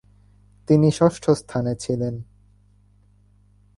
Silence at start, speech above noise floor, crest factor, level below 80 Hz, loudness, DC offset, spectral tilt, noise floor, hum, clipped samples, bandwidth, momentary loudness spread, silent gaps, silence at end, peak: 0.7 s; 36 dB; 20 dB; -52 dBFS; -21 LUFS; under 0.1%; -7.5 dB/octave; -56 dBFS; 50 Hz at -45 dBFS; under 0.1%; 11.5 kHz; 13 LU; none; 1.55 s; -4 dBFS